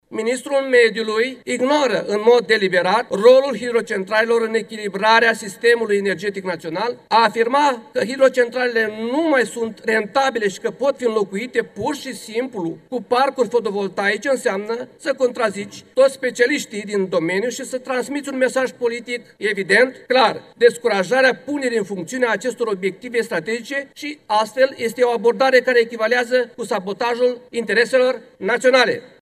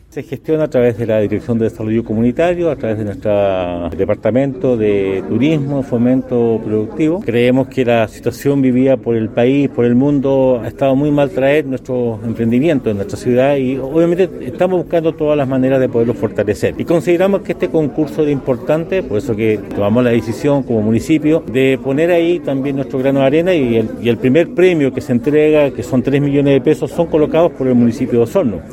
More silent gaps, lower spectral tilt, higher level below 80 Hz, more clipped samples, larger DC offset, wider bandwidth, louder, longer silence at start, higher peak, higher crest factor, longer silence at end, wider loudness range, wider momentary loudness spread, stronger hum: neither; second, -3.5 dB/octave vs -7.5 dB/octave; second, -68 dBFS vs -42 dBFS; neither; neither; second, 13.5 kHz vs 15.5 kHz; second, -19 LUFS vs -14 LUFS; about the same, 0.1 s vs 0.15 s; about the same, 0 dBFS vs 0 dBFS; about the same, 18 dB vs 14 dB; first, 0.15 s vs 0 s; about the same, 5 LU vs 3 LU; first, 10 LU vs 5 LU; neither